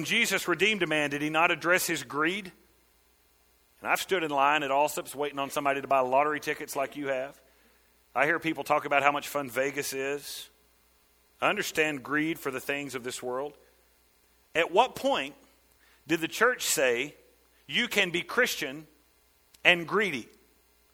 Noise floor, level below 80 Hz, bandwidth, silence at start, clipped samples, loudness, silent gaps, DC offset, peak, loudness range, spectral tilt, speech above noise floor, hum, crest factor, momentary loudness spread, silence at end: -65 dBFS; -68 dBFS; over 20 kHz; 0 s; under 0.1%; -28 LUFS; none; under 0.1%; -2 dBFS; 4 LU; -2.5 dB/octave; 37 dB; none; 26 dB; 11 LU; 0.7 s